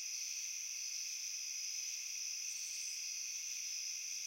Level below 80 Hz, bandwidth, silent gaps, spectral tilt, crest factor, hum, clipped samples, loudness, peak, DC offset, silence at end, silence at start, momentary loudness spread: under -90 dBFS; 16.5 kHz; none; 8 dB/octave; 14 dB; none; under 0.1%; -40 LUFS; -30 dBFS; under 0.1%; 0 s; 0 s; 1 LU